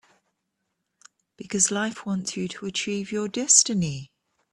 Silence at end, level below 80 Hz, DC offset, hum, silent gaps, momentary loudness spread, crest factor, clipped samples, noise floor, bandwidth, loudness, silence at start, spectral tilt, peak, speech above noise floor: 0.5 s; -64 dBFS; under 0.1%; none; none; 14 LU; 26 dB; under 0.1%; -79 dBFS; 12.5 kHz; -23 LUFS; 1.4 s; -2.5 dB/octave; -2 dBFS; 54 dB